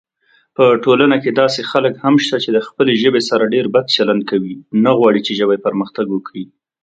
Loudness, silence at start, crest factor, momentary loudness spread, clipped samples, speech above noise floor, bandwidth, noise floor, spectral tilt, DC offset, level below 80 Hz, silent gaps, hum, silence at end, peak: -14 LUFS; 0.6 s; 14 dB; 9 LU; under 0.1%; 43 dB; 9 kHz; -57 dBFS; -5.5 dB/octave; under 0.1%; -62 dBFS; none; none; 0.4 s; 0 dBFS